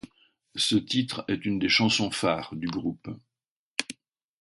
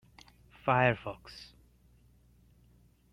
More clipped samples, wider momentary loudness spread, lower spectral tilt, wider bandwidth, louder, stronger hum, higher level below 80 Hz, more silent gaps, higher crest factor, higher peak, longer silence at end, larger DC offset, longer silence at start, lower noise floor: neither; second, 19 LU vs 23 LU; second, -4 dB/octave vs -7 dB/octave; about the same, 11.5 kHz vs 11 kHz; first, -27 LUFS vs -30 LUFS; second, none vs 60 Hz at -60 dBFS; about the same, -60 dBFS vs -62 dBFS; first, 3.48-3.75 s vs none; about the same, 24 dB vs 24 dB; first, -4 dBFS vs -12 dBFS; second, 0.5 s vs 1.7 s; neither; second, 0.05 s vs 0.65 s; first, under -90 dBFS vs -64 dBFS